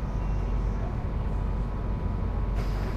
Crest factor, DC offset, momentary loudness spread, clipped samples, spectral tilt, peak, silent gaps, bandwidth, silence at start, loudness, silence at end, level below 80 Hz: 10 dB; under 0.1%; 1 LU; under 0.1%; -8.5 dB/octave; -18 dBFS; none; 6.4 kHz; 0 s; -31 LUFS; 0 s; -30 dBFS